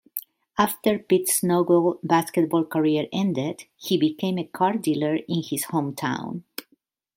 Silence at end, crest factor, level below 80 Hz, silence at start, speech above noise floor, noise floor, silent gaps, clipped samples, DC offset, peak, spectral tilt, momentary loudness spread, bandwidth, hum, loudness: 0.55 s; 20 dB; -66 dBFS; 0.15 s; 44 dB; -67 dBFS; none; under 0.1%; under 0.1%; -4 dBFS; -5 dB/octave; 13 LU; 16.5 kHz; none; -23 LUFS